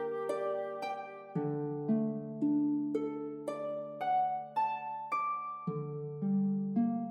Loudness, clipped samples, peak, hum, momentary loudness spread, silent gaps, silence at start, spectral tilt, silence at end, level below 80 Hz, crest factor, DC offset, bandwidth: -35 LUFS; under 0.1%; -20 dBFS; none; 8 LU; none; 0 s; -8.5 dB/octave; 0 s; -80 dBFS; 14 dB; under 0.1%; 11 kHz